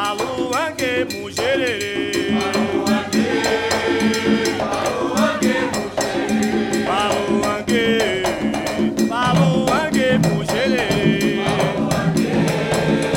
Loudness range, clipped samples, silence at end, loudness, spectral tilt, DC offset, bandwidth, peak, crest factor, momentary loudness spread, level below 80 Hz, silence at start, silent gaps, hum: 2 LU; under 0.1%; 0 s; -19 LUFS; -5 dB/octave; under 0.1%; 17 kHz; -4 dBFS; 16 dB; 4 LU; -44 dBFS; 0 s; none; none